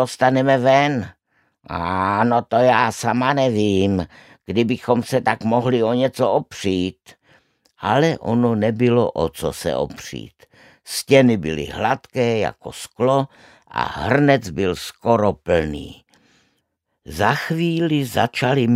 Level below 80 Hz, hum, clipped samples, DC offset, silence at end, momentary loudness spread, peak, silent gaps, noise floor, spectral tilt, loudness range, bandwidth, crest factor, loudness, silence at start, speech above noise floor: -48 dBFS; none; under 0.1%; under 0.1%; 0 s; 12 LU; -2 dBFS; none; -72 dBFS; -6 dB/octave; 3 LU; 16 kHz; 18 dB; -19 LUFS; 0 s; 53 dB